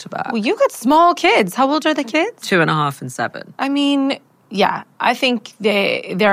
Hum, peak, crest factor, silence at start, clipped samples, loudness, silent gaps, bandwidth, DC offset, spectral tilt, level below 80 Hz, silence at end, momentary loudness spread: none; -4 dBFS; 14 dB; 0 s; under 0.1%; -17 LUFS; none; 16 kHz; under 0.1%; -4.5 dB/octave; -62 dBFS; 0 s; 11 LU